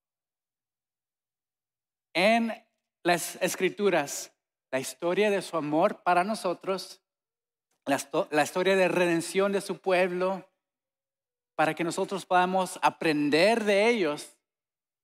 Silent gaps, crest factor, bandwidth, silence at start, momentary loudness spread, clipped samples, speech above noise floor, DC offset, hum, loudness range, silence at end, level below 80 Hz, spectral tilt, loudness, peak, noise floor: none; 18 dB; 16 kHz; 2.15 s; 11 LU; under 0.1%; over 64 dB; under 0.1%; none; 3 LU; 0.75 s; -86 dBFS; -4 dB/octave; -27 LUFS; -10 dBFS; under -90 dBFS